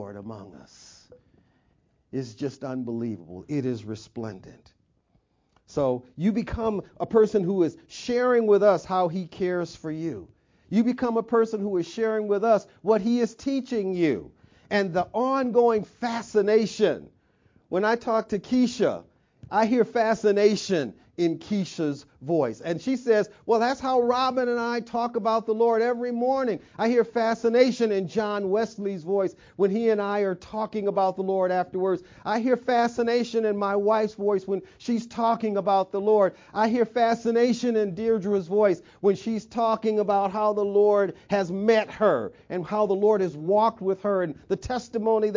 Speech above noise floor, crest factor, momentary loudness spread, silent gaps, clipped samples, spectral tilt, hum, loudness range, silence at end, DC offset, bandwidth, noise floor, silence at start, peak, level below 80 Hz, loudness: 44 dB; 18 dB; 10 LU; none; under 0.1%; -6 dB/octave; none; 5 LU; 0 s; under 0.1%; 7.6 kHz; -68 dBFS; 0 s; -6 dBFS; -58 dBFS; -25 LUFS